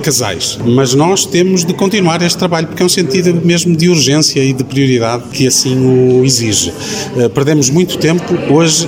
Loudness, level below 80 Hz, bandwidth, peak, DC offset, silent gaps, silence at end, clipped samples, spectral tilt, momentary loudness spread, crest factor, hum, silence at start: -11 LUFS; -46 dBFS; 16.5 kHz; 0 dBFS; 0.1%; none; 0 s; under 0.1%; -4.5 dB/octave; 5 LU; 10 dB; none; 0 s